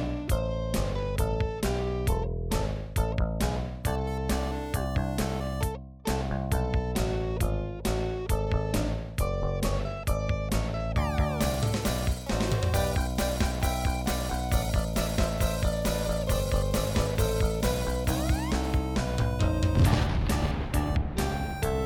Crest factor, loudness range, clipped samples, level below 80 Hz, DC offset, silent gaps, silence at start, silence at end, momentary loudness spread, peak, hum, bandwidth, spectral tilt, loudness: 18 dB; 3 LU; under 0.1%; -32 dBFS; under 0.1%; none; 0 s; 0 s; 4 LU; -10 dBFS; none; 19 kHz; -5.5 dB/octave; -29 LUFS